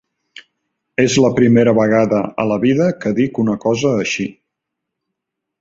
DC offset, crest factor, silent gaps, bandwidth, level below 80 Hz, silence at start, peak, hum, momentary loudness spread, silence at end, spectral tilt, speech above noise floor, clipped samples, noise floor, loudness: under 0.1%; 16 dB; none; 8 kHz; -52 dBFS; 1 s; -2 dBFS; none; 8 LU; 1.3 s; -6 dB/octave; 65 dB; under 0.1%; -79 dBFS; -15 LUFS